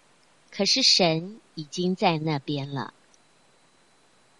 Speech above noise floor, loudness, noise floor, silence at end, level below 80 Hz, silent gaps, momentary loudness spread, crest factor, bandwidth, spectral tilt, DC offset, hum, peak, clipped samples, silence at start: 37 dB; -23 LUFS; -62 dBFS; 1.55 s; -70 dBFS; none; 22 LU; 22 dB; 11.5 kHz; -3.5 dB/octave; under 0.1%; none; -6 dBFS; under 0.1%; 0.5 s